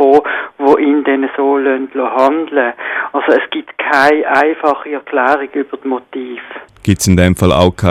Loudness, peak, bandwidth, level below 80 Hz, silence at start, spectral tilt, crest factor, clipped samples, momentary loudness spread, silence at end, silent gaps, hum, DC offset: -13 LUFS; 0 dBFS; 15.5 kHz; -38 dBFS; 0 s; -5.5 dB/octave; 12 dB; 0.1%; 10 LU; 0 s; none; none; under 0.1%